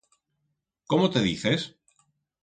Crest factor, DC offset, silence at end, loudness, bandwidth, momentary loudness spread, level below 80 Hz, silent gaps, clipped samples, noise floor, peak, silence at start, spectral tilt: 20 dB; under 0.1%; 0.75 s; -25 LUFS; 9.4 kHz; 6 LU; -58 dBFS; none; under 0.1%; -79 dBFS; -8 dBFS; 0.9 s; -5.5 dB/octave